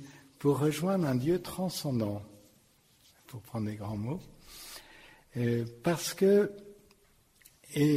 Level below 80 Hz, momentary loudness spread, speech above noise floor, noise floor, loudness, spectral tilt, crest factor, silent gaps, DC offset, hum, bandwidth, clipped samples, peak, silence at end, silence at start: -62 dBFS; 21 LU; 35 dB; -65 dBFS; -31 LUFS; -6 dB/octave; 18 dB; none; under 0.1%; none; 16 kHz; under 0.1%; -16 dBFS; 0 s; 0 s